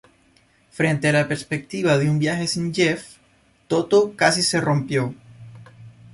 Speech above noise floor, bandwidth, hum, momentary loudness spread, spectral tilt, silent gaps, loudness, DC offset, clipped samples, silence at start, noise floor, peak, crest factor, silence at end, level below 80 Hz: 38 dB; 11.5 kHz; none; 7 LU; -5 dB/octave; none; -21 LUFS; under 0.1%; under 0.1%; 0.75 s; -59 dBFS; -4 dBFS; 18 dB; 0.25 s; -58 dBFS